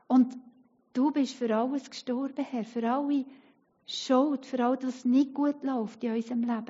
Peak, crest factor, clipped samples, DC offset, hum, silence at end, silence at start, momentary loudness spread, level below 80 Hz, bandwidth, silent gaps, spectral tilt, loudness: -12 dBFS; 16 dB; under 0.1%; under 0.1%; none; 0.05 s; 0.1 s; 9 LU; -86 dBFS; 7.6 kHz; none; -4 dB/octave; -29 LUFS